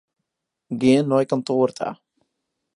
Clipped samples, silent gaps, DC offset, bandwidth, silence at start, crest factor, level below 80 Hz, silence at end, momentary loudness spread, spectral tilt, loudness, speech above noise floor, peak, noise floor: under 0.1%; none; under 0.1%; 11 kHz; 0.7 s; 18 dB; -66 dBFS; 0.8 s; 13 LU; -6.5 dB/octave; -21 LUFS; 61 dB; -4 dBFS; -81 dBFS